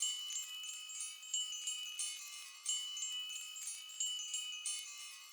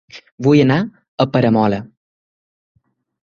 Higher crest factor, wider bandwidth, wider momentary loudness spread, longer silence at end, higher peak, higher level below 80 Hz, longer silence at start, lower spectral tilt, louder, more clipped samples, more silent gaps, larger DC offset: about the same, 20 dB vs 16 dB; first, over 20 kHz vs 7.2 kHz; second, 6 LU vs 10 LU; second, 0 s vs 1.35 s; second, -24 dBFS vs -2 dBFS; second, under -90 dBFS vs -52 dBFS; second, 0 s vs 0.15 s; second, 7.5 dB/octave vs -8 dB/octave; second, -41 LUFS vs -16 LUFS; neither; second, none vs 0.32-0.38 s, 1.08-1.18 s; neither